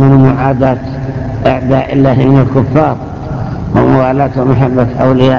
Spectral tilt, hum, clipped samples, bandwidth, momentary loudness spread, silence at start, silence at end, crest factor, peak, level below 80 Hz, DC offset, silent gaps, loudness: -9.5 dB/octave; none; 0.7%; 6.6 kHz; 11 LU; 0 s; 0 s; 10 dB; 0 dBFS; -28 dBFS; under 0.1%; none; -10 LUFS